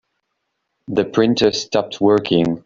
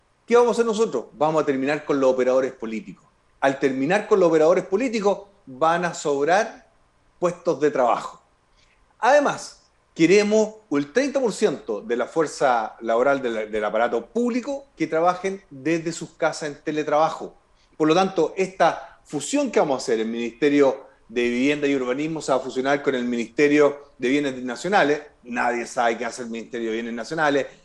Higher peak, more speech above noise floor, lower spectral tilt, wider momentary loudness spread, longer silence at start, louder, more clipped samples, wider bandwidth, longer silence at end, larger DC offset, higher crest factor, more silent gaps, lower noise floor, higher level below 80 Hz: first, -2 dBFS vs -6 dBFS; first, 58 dB vs 38 dB; about the same, -5.5 dB/octave vs -5 dB/octave; second, 6 LU vs 11 LU; first, 0.9 s vs 0.3 s; first, -17 LUFS vs -22 LUFS; neither; second, 7.6 kHz vs 11.5 kHz; about the same, 0.05 s vs 0.15 s; neither; about the same, 16 dB vs 16 dB; neither; first, -74 dBFS vs -60 dBFS; first, -54 dBFS vs -62 dBFS